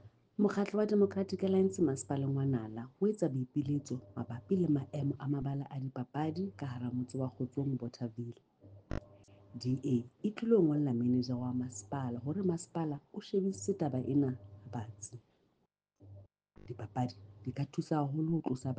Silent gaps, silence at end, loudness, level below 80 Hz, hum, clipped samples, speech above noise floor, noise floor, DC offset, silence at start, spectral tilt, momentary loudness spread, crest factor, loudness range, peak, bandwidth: none; 0 s; -35 LUFS; -64 dBFS; none; under 0.1%; 45 dB; -80 dBFS; under 0.1%; 0.05 s; -7.5 dB/octave; 14 LU; 18 dB; 7 LU; -18 dBFS; 9.6 kHz